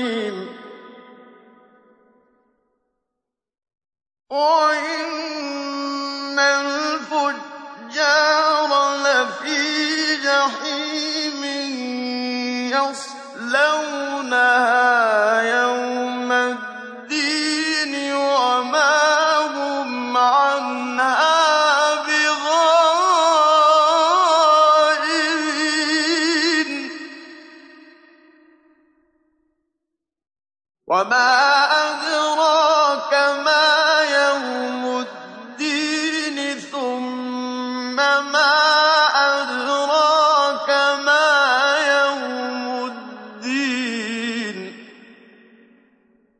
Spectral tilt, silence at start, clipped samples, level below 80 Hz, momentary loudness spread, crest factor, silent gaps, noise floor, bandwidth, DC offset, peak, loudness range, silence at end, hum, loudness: -1 dB/octave; 0 s; under 0.1%; -84 dBFS; 12 LU; 16 dB; none; -83 dBFS; 10 kHz; under 0.1%; -4 dBFS; 9 LU; 1.5 s; none; -18 LUFS